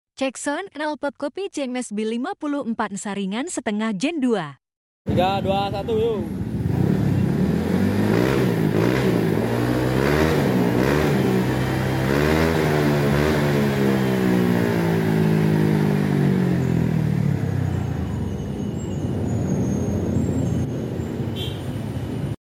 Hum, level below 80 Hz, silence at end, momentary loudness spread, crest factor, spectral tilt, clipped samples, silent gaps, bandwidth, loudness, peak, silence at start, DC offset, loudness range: none; -40 dBFS; 0.2 s; 8 LU; 14 dB; -7 dB/octave; under 0.1%; 4.77-5.05 s; 17 kHz; -22 LUFS; -6 dBFS; 0.2 s; under 0.1%; 6 LU